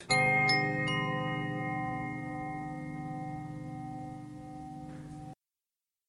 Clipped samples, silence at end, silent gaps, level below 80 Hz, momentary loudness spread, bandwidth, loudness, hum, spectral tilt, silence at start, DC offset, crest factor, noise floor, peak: under 0.1%; 0.75 s; none; -60 dBFS; 20 LU; 11.5 kHz; -32 LUFS; none; -4.5 dB/octave; 0 s; under 0.1%; 20 dB; under -90 dBFS; -16 dBFS